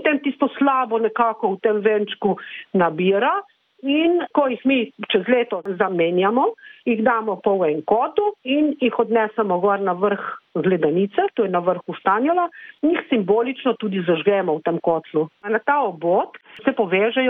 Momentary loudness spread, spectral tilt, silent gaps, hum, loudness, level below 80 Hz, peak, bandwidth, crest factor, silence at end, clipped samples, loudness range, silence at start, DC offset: 5 LU; -9 dB/octave; none; none; -20 LUFS; -68 dBFS; -6 dBFS; 3.9 kHz; 14 dB; 0 s; under 0.1%; 1 LU; 0 s; under 0.1%